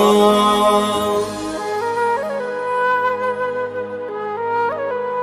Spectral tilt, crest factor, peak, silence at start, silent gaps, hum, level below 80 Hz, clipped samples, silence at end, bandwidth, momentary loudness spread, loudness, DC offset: -4 dB/octave; 16 dB; -2 dBFS; 0 s; none; none; -50 dBFS; under 0.1%; 0 s; 14.5 kHz; 11 LU; -19 LUFS; under 0.1%